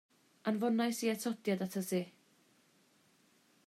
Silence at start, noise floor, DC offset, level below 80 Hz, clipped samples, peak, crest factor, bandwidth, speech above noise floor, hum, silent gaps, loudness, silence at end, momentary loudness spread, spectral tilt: 0.45 s; -70 dBFS; under 0.1%; -90 dBFS; under 0.1%; -22 dBFS; 16 dB; 15.5 kHz; 35 dB; none; none; -36 LUFS; 1.55 s; 6 LU; -5 dB/octave